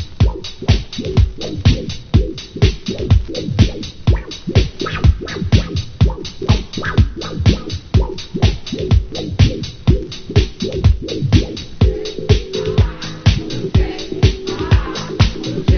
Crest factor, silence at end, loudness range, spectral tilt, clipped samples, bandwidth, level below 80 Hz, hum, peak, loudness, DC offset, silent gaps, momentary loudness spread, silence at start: 16 dB; 0 s; 1 LU; -6.5 dB/octave; under 0.1%; 6.6 kHz; -20 dBFS; none; 0 dBFS; -17 LUFS; under 0.1%; none; 6 LU; 0 s